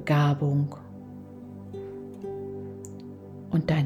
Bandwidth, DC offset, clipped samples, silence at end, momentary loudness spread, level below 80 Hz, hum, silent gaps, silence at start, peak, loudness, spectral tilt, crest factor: 8.2 kHz; under 0.1%; under 0.1%; 0 s; 20 LU; -60 dBFS; none; none; 0 s; -12 dBFS; -29 LUFS; -8 dB/octave; 18 dB